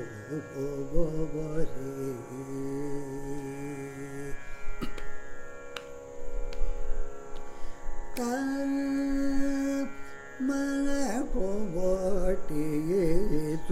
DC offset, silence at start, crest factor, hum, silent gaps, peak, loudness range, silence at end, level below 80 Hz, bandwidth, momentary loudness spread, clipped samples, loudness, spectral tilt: under 0.1%; 0 s; 16 dB; none; none; -12 dBFS; 11 LU; 0 s; -36 dBFS; 13 kHz; 15 LU; under 0.1%; -33 LUFS; -6.5 dB/octave